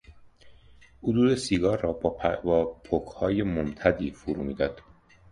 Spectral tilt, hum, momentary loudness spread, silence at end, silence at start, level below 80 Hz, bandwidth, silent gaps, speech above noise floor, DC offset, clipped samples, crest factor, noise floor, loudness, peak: -6.5 dB/octave; none; 8 LU; 0.5 s; 0.1 s; -46 dBFS; 11 kHz; none; 28 dB; under 0.1%; under 0.1%; 20 dB; -54 dBFS; -27 LUFS; -6 dBFS